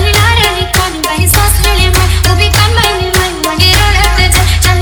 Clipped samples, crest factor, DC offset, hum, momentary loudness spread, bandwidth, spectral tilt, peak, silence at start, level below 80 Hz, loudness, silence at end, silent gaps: 0.2%; 8 dB; under 0.1%; none; 4 LU; over 20 kHz; -3 dB/octave; 0 dBFS; 0 s; -14 dBFS; -8 LUFS; 0 s; none